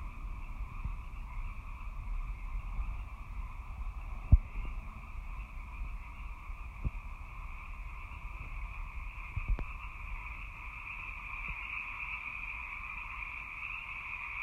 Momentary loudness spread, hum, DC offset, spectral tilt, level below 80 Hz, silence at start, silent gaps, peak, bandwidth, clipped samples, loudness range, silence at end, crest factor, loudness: 8 LU; none; under 0.1%; -6.5 dB/octave; -40 dBFS; 0 s; none; -10 dBFS; 7.2 kHz; under 0.1%; 7 LU; 0 s; 28 dB; -41 LUFS